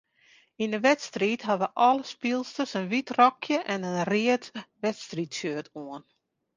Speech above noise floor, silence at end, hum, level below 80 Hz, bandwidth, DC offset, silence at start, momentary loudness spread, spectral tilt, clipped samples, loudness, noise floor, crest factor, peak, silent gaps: 34 dB; 0.55 s; none; -74 dBFS; 9.8 kHz; under 0.1%; 0.6 s; 13 LU; -4.5 dB/octave; under 0.1%; -27 LUFS; -61 dBFS; 20 dB; -6 dBFS; none